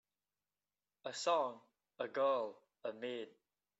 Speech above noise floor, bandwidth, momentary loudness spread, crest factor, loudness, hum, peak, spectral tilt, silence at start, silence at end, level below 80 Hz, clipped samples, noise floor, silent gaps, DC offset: over 51 dB; 8 kHz; 14 LU; 20 dB; -40 LUFS; 50 Hz at -90 dBFS; -22 dBFS; -1.5 dB/octave; 1.05 s; 0.5 s; under -90 dBFS; under 0.1%; under -90 dBFS; none; under 0.1%